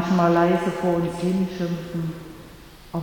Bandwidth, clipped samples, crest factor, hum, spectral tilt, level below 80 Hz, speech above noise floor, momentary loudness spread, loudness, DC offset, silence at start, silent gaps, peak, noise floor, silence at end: 18.5 kHz; under 0.1%; 16 dB; none; -7.5 dB/octave; -50 dBFS; 22 dB; 18 LU; -23 LUFS; under 0.1%; 0 s; none; -8 dBFS; -44 dBFS; 0 s